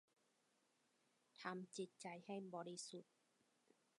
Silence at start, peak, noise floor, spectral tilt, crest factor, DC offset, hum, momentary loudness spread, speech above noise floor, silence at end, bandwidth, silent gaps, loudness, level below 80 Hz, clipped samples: 1.35 s; -34 dBFS; -83 dBFS; -4 dB/octave; 24 dB; under 0.1%; none; 5 LU; 31 dB; 0.95 s; 11.5 kHz; none; -53 LUFS; under -90 dBFS; under 0.1%